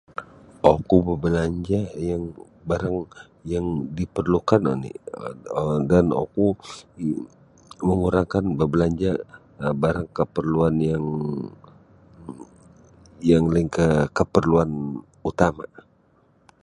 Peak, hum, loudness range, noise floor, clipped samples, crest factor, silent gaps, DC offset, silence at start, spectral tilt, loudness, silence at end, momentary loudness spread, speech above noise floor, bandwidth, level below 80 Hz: 0 dBFS; none; 4 LU; -60 dBFS; under 0.1%; 22 dB; none; under 0.1%; 0.2 s; -8 dB/octave; -23 LUFS; 1 s; 18 LU; 38 dB; 10.5 kHz; -42 dBFS